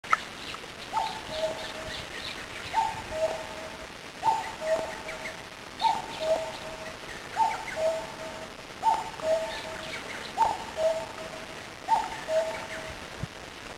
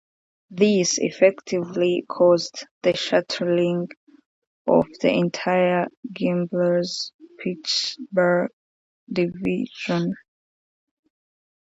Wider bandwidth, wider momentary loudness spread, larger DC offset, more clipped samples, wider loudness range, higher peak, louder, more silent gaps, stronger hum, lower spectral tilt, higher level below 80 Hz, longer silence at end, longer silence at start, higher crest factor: first, 16 kHz vs 8 kHz; about the same, 11 LU vs 12 LU; neither; neither; about the same, 2 LU vs 4 LU; second, -6 dBFS vs -2 dBFS; second, -32 LUFS vs -22 LUFS; second, none vs 2.71-2.81 s, 3.97-4.07 s, 4.26-4.65 s, 5.97-6.03 s, 7.14-7.19 s, 8.53-9.07 s; neither; second, -3 dB/octave vs -4.5 dB/octave; first, -56 dBFS vs -64 dBFS; second, 0 s vs 1.45 s; second, 0.05 s vs 0.5 s; first, 26 dB vs 20 dB